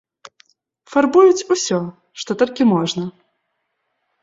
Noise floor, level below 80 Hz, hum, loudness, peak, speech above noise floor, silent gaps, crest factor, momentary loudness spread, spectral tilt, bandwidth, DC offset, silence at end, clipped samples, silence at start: -73 dBFS; -64 dBFS; none; -17 LUFS; -2 dBFS; 57 dB; none; 16 dB; 17 LU; -5 dB/octave; 7.8 kHz; under 0.1%; 1.15 s; under 0.1%; 0.9 s